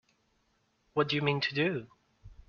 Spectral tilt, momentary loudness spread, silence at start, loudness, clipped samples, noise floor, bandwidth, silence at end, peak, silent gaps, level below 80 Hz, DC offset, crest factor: -3.5 dB/octave; 7 LU; 0.95 s; -31 LUFS; under 0.1%; -74 dBFS; 6.8 kHz; 0.15 s; -14 dBFS; none; -62 dBFS; under 0.1%; 20 dB